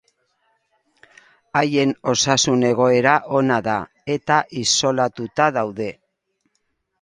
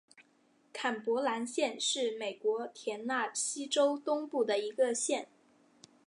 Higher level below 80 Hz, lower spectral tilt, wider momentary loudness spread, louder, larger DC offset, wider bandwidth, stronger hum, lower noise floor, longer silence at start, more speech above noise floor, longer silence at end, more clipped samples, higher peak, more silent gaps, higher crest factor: first, -58 dBFS vs under -90 dBFS; first, -3.5 dB/octave vs -1 dB/octave; about the same, 9 LU vs 7 LU; first, -19 LUFS vs -33 LUFS; neither; about the same, 11 kHz vs 11.5 kHz; neither; about the same, -71 dBFS vs -69 dBFS; first, 1.55 s vs 0.2 s; first, 53 dB vs 36 dB; first, 1.1 s vs 0.8 s; neither; first, 0 dBFS vs -18 dBFS; neither; about the same, 20 dB vs 18 dB